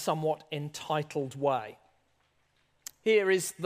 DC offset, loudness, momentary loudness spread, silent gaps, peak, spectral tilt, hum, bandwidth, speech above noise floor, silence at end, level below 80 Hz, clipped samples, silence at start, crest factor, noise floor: under 0.1%; -30 LUFS; 18 LU; none; -14 dBFS; -4.5 dB/octave; none; 15.5 kHz; 41 dB; 0 s; -78 dBFS; under 0.1%; 0 s; 18 dB; -71 dBFS